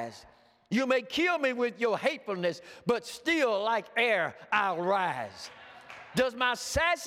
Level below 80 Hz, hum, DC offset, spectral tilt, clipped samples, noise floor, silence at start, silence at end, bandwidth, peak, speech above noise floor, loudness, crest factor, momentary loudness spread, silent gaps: -58 dBFS; none; under 0.1%; -3.5 dB/octave; under 0.1%; -49 dBFS; 0 s; 0 s; 16 kHz; -12 dBFS; 19 dB; -29 LUFS; 18 dB; 13 LU; none